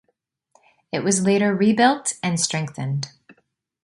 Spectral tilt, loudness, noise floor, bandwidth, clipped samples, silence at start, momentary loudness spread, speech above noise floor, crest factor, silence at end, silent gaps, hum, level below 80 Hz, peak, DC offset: -4.5 dB/octave; -21 LUFS; -72 dBFS; 11.5 kHz; under 0.1%; 0.95 s; 11 LU; 52 dB; 18 dB; 0.5 s; none; none; -64 dBFS; -4 dBFS; under 0.1%